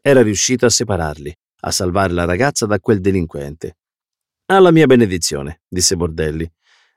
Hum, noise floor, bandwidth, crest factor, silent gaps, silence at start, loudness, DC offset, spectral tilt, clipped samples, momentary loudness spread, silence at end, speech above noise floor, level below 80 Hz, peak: none; -86 dBFS; 16 kHz; 14 dB; none; 0.05 s; -15 LUFS; under 0.1%; -4.5 dB/octave; under 0.1%; 18 LU; 0.5 s; 71 dB; -38 dBFS; -2 dBFS